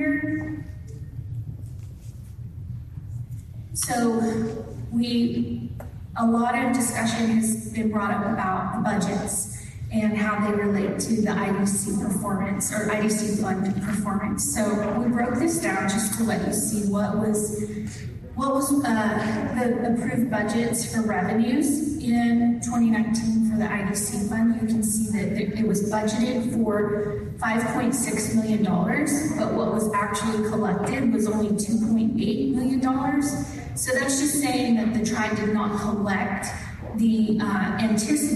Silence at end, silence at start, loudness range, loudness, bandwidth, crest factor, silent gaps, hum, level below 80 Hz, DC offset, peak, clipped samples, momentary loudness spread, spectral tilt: 0 s; 0 s; 2 LU; -24 LUFS; 12.5 kHz; 12 dB; none; none; -46 dBFS; under 0.1%; -12 dBFS; under 0.1%; 11 LU; -5 dB/octave